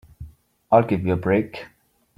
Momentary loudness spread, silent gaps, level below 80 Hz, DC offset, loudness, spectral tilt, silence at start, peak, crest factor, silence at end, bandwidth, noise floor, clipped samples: 14 LU; none; -50 dBFS; under 0.1%; -21 LUFS; -9 dB/octave; 0.2 s; -2 dBFS; 20 dB; 0.5 s; 14.5 kHz; -45 dBFS; under 0.1%